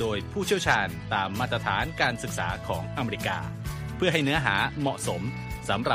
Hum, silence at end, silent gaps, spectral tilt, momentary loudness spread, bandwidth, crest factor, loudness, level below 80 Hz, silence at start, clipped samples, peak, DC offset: none; 0 s; none; -4.5 dB/octave; 9 LU; 15.5 kHz; 20 dB; -27 LUFS; -44 dBFS; 0 s; under 0.1%; -8 dBFS; under 0.1%